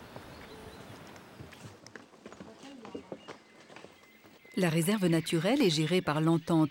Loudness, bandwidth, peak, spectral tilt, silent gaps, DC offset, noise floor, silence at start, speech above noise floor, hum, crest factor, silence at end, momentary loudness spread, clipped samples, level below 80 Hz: -29 LUFS; 16.5 kHz; -16 dBFS; -5.5 dB/octave; none; under 0.1%; -58 dBFS; 0 s; 30 dB; none; 16 dB; 0 s; 24 LU; under 0.1%; -68 dBFS